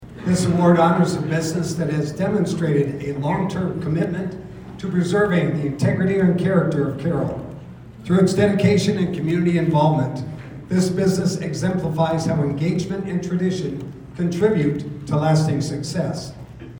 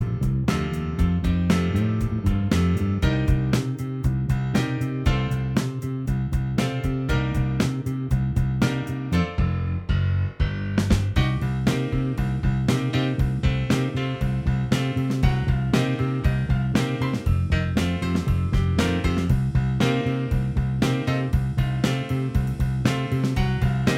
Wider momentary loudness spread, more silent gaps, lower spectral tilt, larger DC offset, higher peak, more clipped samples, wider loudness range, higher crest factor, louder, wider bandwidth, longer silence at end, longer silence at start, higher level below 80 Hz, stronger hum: first, 13 LU vs 3 LU; neither; about the same, -7 dB/octave vs -7 dB/octave; neither; about the same, -4 dBFS vs -6 dBFS; neither; about the same, 3 LU vs 2 LU; about the same, 16 dB vs 16 dB; first, -20 LUFS vs -24 LUFS; first, 18.5 kHz vs 14.5 kHz; about the same, 0 s vs 0 s; about the same, 0 s vs 0 s; second, -48 dBFS vs -30 dBFS; neither